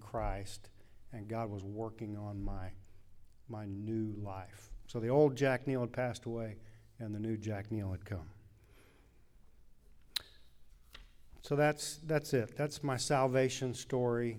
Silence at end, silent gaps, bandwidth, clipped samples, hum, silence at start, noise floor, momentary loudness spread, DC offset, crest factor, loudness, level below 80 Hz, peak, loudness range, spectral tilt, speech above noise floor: 0 s; none; over 20 kHz; under 0.1%; none; 0 s; -62 dBFS; 18 LU; under 0.1%; 22 dB; -36 LUFS; -54 dBFS; -14 dBFS; 10 LU; -5.5 dB/octave; 27 dB